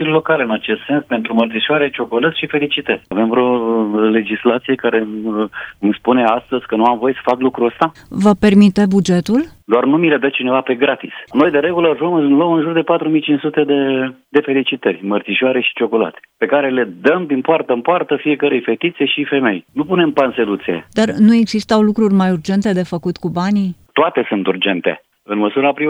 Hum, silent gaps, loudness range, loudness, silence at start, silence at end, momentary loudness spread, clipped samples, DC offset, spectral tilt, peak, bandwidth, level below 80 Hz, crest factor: none; none; 3 LU; -15 LUFS; 0 s; 0 s; 6 LU; under 0.1%; under 0.1%; -6.5 dB/octave; 0 dBFS; 10.5 kHz; -52 dBFS; 14 dB